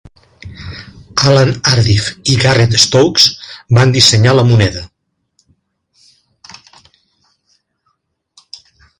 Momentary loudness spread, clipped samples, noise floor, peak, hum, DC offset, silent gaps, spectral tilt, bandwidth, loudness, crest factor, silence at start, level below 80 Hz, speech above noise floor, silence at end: 22 LU; under 0.1%; -65 dBFS; 0 dBFS; none; under 0.1%; none; -4 dB/octave; 16 kHz; -10 LUFS; 14 dB; 0.45 s; -38 dBFS; 55 dB; 4.15 s